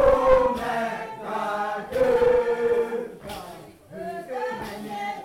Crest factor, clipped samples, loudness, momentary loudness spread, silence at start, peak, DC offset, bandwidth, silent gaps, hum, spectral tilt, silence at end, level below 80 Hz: 18 dB; under 0.1%; -24 LUFS; 18 LU; 0 s; -6 dBFS; under 0.1%; 15.5 kHz; none; none; -5.5 dB/octave; 0 s; -44 dBFS